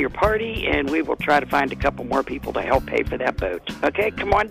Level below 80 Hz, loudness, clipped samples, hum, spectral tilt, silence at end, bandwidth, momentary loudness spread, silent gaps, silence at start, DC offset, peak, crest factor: -36 dBFS; -22 LUFS; under 0.1%; none; -6 dB/octave; 0 s; 15.5 kHz; 5 LU; none; 0 s; under 0.1%; -4 dBFS; 18 dB